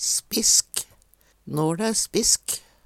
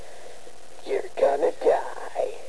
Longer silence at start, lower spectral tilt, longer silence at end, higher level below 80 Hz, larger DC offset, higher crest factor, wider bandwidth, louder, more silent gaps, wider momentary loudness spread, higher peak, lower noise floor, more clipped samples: about the same, 0 s vs 0 s; second, -2 dB/octave vs -4 dB/octave; first, 0.25 s vs 0 s; first, -54 dBFS vs -62 dBFS; second, under 0.1% vs 2%; about the same, 22 dB vs 18 dB; first, 18.5 kHz vs 11 kHz; first, -21 LUFS vs -25 LUFS; neither; second, 13 LU vs 22 LU; first, -4 dBFS vs -8 dBFS; first, -60 dBFS vs -47 dBFS; neither